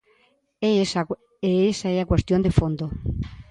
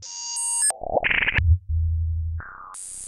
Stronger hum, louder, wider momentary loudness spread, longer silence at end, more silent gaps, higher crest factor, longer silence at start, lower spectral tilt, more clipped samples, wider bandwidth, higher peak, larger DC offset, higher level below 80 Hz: neither; about the same, -23 LUFS vs -23 LUFS; second, 9 LU vs 15 LU; about the same, 0.1 s vs 0 s; neither; about the same, 20 dB vs 18 dB; first, 0.6 s vs 0 s; first, -6.5 dB/octave vs -2.5 dB/octave; neither; second, 10.5 kHz vs 13 kHz; first, -2 dBFS vs -6 dBFS; neither; second, -36 dBFS vs -30 dBFS